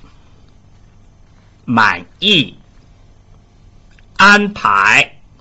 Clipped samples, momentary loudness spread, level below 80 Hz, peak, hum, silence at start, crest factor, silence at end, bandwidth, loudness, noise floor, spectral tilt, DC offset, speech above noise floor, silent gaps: under 0.1%; 14 LU; -46 dBFS; 0 dBFS; none; 1.65 s; 16 dB; 0.35 s; 8.2 kHz; -11 LUFS; -45 dBFS; -3.5 dB/octave; under 0.1%; 34 dB; none